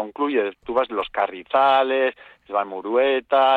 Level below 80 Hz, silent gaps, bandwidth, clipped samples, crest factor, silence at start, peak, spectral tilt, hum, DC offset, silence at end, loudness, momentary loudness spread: -60 dBFS; none; 4.7 kHz; under 0.1%; 14 dB; 0 s; -8 dBFS; -5.5 dB/octave; none; under 0.1%; 0 s; -21 LUFS; 8 LU